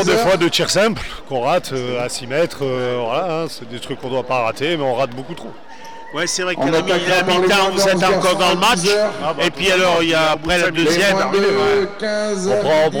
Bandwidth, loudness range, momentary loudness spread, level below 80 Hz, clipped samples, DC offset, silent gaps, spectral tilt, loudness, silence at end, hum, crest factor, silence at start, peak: over 20 kHz; 7 LU; 12 LU; -44 dBFS; under 0.1%; 2%; none; -3.5 dB/octave; -17 LUFS; 0 s; none; 10 dB; 0 s; -6 dBFS